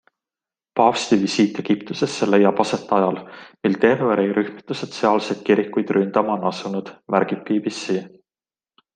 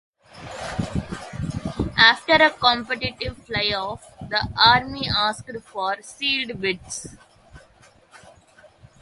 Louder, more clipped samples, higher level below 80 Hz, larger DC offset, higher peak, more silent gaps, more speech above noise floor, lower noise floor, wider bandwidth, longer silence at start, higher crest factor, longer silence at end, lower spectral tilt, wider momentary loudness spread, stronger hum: about the same, -20 LUFS vs -21 LUFS; neither; second, -66 dBFS vs -44 dBFS; neither; about the same, 0 dBFS vs 0 dBFS; neither; first, over 70 dB vs 32 dB; first, under -90 dBFS vs -54 dBFS; second, 9.6 kHz vs 11.5 kHz; first, 0.75 s vs 0.35 s; about the same, 20 dB vs 24 dB; first, 0.9 s vs 0.7 s; first, -5.5 dB/octave vs -3.5 dB/octave; second, 10 LU vs 19 LU; neither